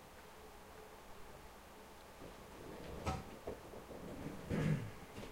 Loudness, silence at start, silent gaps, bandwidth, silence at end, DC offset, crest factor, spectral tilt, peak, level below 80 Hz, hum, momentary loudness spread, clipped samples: -47 LUFS; 0 s; none; 16 kHz; 0 s; under 0.1%; 22 dB; -6.5 dB/octave; -26 dBFS; -58 dBFS; none; 17 LU; under 0.1%